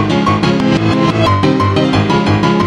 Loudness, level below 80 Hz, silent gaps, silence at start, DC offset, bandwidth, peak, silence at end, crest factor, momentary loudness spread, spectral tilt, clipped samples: -12 LUFS; -34 dBFS; none; 0 s; under 0.1%; 10.5 kHz; 0 dBFS; 0 s; 10 dB; 1 LU; -6.5 dB/octave; under 0.1%